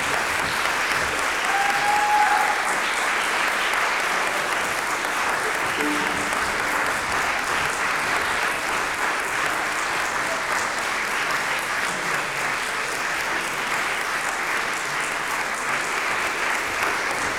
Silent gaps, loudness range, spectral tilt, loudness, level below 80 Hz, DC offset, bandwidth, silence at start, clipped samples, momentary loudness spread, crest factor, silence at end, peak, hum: none; 3 LU; -1 dB/octave; -22 LUFS; -52 dBFS; under 0.1%; over 20 kHz; 0 s; under 0.1%; 4 LU; 16 dB; 0 s; -6 dBFS; none